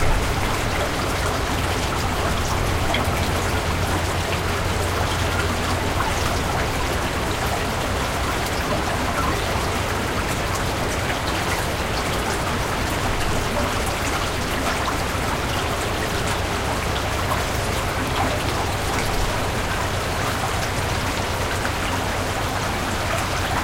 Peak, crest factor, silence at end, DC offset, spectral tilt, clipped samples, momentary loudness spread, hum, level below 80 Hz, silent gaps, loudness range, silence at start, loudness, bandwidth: -6 dBFS; 16 dB; 0 s; under 0.1%; -4 dB/octave; under 0.1%; 1 LU; none; -30 dBFS; none; 1 LU; 0 s; -23 LUFS; 16 kHz